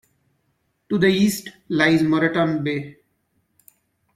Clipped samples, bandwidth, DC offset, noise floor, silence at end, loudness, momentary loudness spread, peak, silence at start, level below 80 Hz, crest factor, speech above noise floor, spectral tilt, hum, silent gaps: under 0.1%; 16 kHz; under 0.1%; -70 dBFS; 1.25 s; -20 LUFS; 12 LU; -4 dBFS; 0.9 s; -60 dBFS; 20 dB; 50 dB; -5.5 dB/octave; none; none